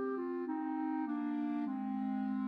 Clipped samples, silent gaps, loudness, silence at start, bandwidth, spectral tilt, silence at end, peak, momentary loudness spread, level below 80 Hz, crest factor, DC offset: under 0.1%; none; -38 LUFS; 0 s; 5 kHz; -9.5 dB/octave; 0 s; -28 dBFS; 2 LU; -82 dBFS; 10 dB; under 0.1%